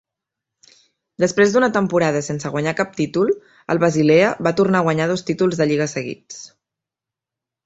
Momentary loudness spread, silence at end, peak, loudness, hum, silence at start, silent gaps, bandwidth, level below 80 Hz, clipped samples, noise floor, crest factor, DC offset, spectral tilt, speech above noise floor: 11 LU; 1.2 s; -2 dBFS; -18 LUFS; none; 1.2 s; none; 8.2 kHz; -58 dBFS; under 0.1%; -87 dBFS; 18 dB; under 0.1%; -5.5 dB/octave; 69 dB